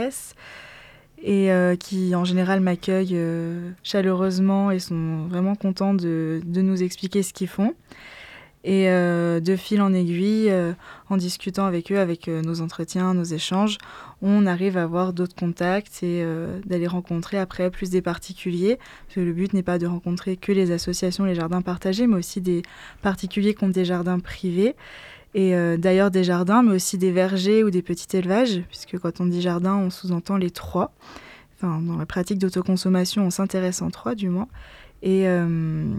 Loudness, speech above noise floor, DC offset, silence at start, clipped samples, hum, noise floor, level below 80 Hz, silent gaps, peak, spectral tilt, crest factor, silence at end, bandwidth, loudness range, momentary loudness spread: -23 LUFS; 25 dB; under 0.1%; 0 s; under 0.1%; none; -47 dBFS; -52 dBFS; none; -8 dBFS; -6.5 dB/octave; 16 dB; 0 s; 14 kHz; 5 LU; 10 LU